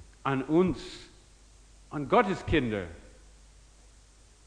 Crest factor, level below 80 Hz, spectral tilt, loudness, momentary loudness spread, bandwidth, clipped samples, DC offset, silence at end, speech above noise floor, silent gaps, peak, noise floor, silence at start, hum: 22 dB; -50 dBFS; -6.5 dB/octave; -28 LUFS; 18 LU; 10.5 kHz; under 0.1%; under 0.1%; 1.45 s; 29 dB; none; -10 dBFS; -57 dBFS; 0 s; none